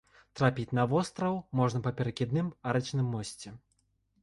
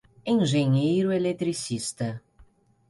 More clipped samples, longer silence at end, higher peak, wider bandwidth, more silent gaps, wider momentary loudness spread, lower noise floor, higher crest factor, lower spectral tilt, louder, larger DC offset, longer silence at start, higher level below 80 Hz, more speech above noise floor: neither; first, 0.65 s vs 0.45 s; about the same, -12 dBFS vs -12 dBFS; about the same, 11.5 kHz vs 11.5 kHz; neither; about the same, 12 LU vs 10 LU; first, -74 dBFS vs -57 dBFS; first, 20 dB vs 14 dB; about the same, -6.5 dB/octave vs -6 dB/octave; second, -31 LUFS vs -25 LUFS; neither; about the same, 0.35 s vs 0.25 s; about the same, -60 dBFS vs -62 dBFS; first, 44 dB vs 33 dB